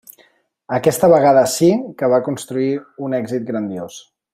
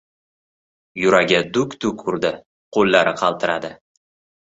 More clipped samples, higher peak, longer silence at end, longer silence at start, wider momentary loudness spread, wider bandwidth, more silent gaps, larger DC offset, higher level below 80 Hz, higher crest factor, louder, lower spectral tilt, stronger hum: neither; about the same, -2 dBFS vs -2 dBFS; second, 0.35 s vs 0.75 s; second, 0.7 s vs 0.95 s; about the same, 13 LU vs 11 LU; first, 16 kHz vs 8 kHz; second, none vs 2.46-2.72 s; neither; about the same, -58 dBFS vs -56 dBFS; about the same, 16 dB vs 20 dB; about the same, -17 LUFS vs -19 LUFS; about the same, -5.5 dB/octave vs -4.5 dB/octave; neither